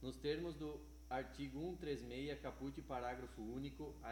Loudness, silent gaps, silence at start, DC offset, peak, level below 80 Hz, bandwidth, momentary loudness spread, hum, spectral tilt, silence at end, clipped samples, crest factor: -48 LUFS; none; 0 s; under 0.1%; -30 dBFS; -58 dBFS; 19 kHz; 6 LU; none; -6 dB/octave; 0 s; under 0.1%; 16 dB